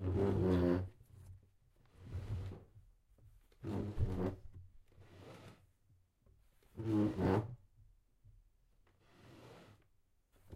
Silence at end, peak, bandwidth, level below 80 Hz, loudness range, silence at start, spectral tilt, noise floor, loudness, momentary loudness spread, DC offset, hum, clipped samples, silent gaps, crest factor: 0 s; -20 dBFS; 12 kHz; -54 dBFS; 6 LU; 0 s; -9 dB/octave; -74 dBFS; -38 LUFS; 26 LU; under 0.1%; none; under 0.1%; none; 20 dB